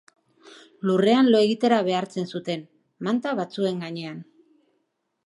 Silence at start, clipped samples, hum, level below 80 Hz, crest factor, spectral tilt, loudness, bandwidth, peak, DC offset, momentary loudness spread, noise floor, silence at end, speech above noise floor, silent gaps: 0.85 s; under 0.1%; none; -78 dBFS; 18 dB; -6.5 dB/octave; -23 LUFS; 11 kHz; -6 dBFS; under 0.1%; 15 LU; -74 dBFS; 1 s; 52 dB; none